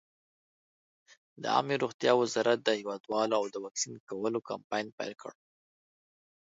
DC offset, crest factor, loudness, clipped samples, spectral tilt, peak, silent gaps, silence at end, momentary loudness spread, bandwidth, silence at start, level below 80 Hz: under 0.1%; 22 dB; -31 LUFS; under 0.1%; -3.5 dB/octave; -10 dBFS; 1.94-1.99 s, 3.00-3.04 s, 3.71-3.75 s, 4.00-4.07 s, 4.64-4.70 s, 4.92-4.98 s; 1.15 s; 12 LU; 8 kHz; 1.4 s; -82 dBFS